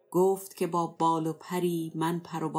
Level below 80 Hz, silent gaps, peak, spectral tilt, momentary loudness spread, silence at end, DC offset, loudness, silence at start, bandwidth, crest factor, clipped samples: under -90 dBFS; none; -14 dBFS; -6.5 dB/octave; 5 LU; 0 s; under 0.1%; -30 LUFS; 0.1 s; 16.5 kHz; 14 dB; under 0.1%